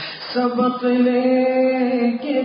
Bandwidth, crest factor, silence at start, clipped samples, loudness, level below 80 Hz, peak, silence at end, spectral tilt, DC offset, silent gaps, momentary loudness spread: 5.4 kHz; 12 dB; 0 s; under 0.1%; -18 LUFS; -70 dBFS; -6 dBFS; 0 s; -10 dB/octave; under 0.1%; none; 4 LU